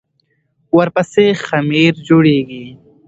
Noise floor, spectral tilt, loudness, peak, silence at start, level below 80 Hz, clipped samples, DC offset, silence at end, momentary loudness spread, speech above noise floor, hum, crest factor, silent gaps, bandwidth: -63 dBFS; -7 dB/octave; -13 LUFS; 0 dBFS; 0.75 s; -52 dBFS; under 0.1%; under 0.1%; 0.35 s; 7 LU; 51 dB; none; 14 dB; none; 8 kHz